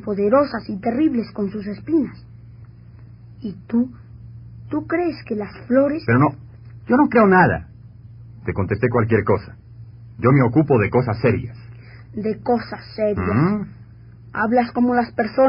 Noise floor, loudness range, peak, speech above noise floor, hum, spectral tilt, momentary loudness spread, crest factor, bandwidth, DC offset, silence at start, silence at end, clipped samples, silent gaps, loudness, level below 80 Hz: -42 dBFS; 8 LU; -2 dBFS; 24 dB; none; -7.5 dB/octave; 18 LU; 18 dB; 5.4 kHz; under 0.1%; 0 s; 0 s; under 0.1%; none; -19 LUFS; -46 dBFS